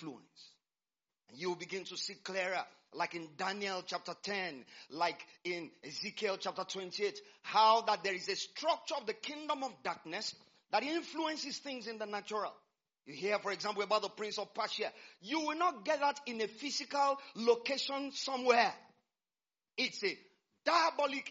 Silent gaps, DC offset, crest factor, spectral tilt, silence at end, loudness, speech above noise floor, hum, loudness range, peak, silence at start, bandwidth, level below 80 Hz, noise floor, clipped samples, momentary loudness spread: none; under 0.1%; 24 dB; -0.5 dB/octave; 0 s; -36 LUFS; over 53 dB; none; 5 LU; -14 dBFS; 0 s; 7.6 kHz; -90 dBFS; under -90 dBFS; under 0.1%; 12 LU